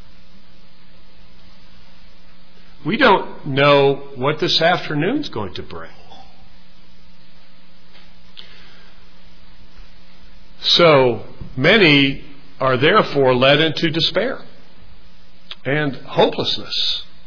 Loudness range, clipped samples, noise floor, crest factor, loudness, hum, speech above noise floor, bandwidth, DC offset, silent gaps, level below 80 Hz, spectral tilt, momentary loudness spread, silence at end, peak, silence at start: 9 LU; under 0.1%; -49 dBFS; 18 dB; -16 LUFS; none; 33 dB; 5.4 kHz; 4%; none; -48 dBFS; -5.5 dB/octave; 18 LU; 0.25 s; -2 dBFS; 2.85 s